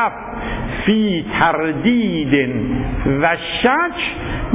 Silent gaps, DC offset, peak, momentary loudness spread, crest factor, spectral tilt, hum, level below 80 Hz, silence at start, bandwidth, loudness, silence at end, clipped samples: none; under 0.1%; -2 dBFS; 8 LU; 16 dB; -10 dB/octave; none; -32 dBFS; 0 s; 4 kHz; -18 LUFS; 0 s; under 0.1%